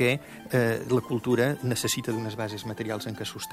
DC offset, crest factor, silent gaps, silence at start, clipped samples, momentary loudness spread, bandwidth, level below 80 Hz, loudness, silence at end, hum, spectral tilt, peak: under 0.1%; 16 dB; none; 0 s; under 0.1%; 8 LU; 16 kHz; -60 dBFS; -28 LUFS; 0 s; none; -5 dB/octave; -10 dBFS